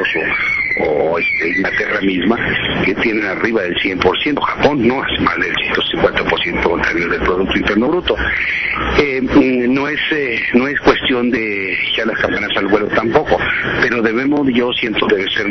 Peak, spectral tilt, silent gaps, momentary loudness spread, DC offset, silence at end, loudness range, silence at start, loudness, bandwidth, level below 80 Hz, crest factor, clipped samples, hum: -2 dBFS; -6 dB/octave; none; 3 LU; under 0.1%; 0 s; 1 LU; 0 s; -15 LUFS; 6.4 kHz; -36 dBFS; 12 dB; under 0.1%; none